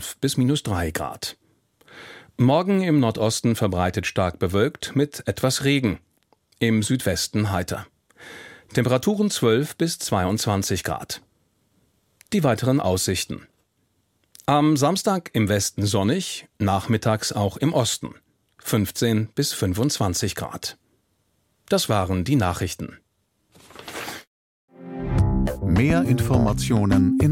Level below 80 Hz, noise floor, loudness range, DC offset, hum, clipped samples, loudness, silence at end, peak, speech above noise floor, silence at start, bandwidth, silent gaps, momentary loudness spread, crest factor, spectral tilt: -40 dBFS; -70 dBFS; 4 LU; under 0.1%; none; under 0.1%; -22 LUFS; 0 s; -4 dBFS; 48 dB; 0 s; 16.5 kHz; 24.27-24.68 s; 14 LU; 18 dB; -5 dB/octave